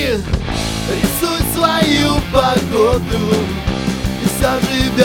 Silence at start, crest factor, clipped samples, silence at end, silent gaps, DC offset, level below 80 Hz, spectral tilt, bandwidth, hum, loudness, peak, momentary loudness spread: 0 s; 16 dB; under 0.1%; 0 s; none; under 0.1%; -26 dBFS; -5 dB/octave; 18 kHz; none; -16 LUFS; 0 dBFS; 6 LU